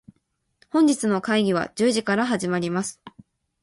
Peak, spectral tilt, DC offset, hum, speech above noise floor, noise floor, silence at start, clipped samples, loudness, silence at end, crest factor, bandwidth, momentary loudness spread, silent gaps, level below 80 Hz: -8 dBFS; -5 dB/octave; under 0.1%; none; 50 dB; -72 dBFS; 0.75 s; under 0.1%; -23 LUFS; 0.55 s; 16 dB; 11.5 kHz; 7 LU; none; -64 dBFS